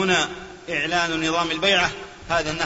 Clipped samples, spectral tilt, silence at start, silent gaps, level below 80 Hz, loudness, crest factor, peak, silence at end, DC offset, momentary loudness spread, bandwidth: under 0.1%; -3 dB/octave; 0 s; none; -48 dBFS; -22 LUFS; 16 dB; -6 dBFS; 0 s; under 0.1%; 9 LU; 8 kHz